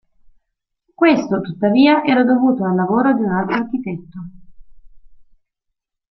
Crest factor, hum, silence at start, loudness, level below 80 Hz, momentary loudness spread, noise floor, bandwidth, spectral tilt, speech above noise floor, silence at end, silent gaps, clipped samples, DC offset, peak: 16 dB; none; 1 s; -16 LUFS; -52 dBFS; 17 LU; -77 dBFS; 6.2 kHz; -7.5 dB/octave; 61 dB; 0.9 s; none; under 0.1%; under 0.1%; -2 dBFS